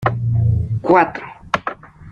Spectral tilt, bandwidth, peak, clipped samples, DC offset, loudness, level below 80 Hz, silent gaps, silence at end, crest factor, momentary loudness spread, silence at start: -8.5 dB/octave; 6.8 kHz; 0 dBFS; under 0.1%; under 0.1%; -18 LUFS; -40 dBFS; none; 0 s; 18 dB; 16 LU; 0 s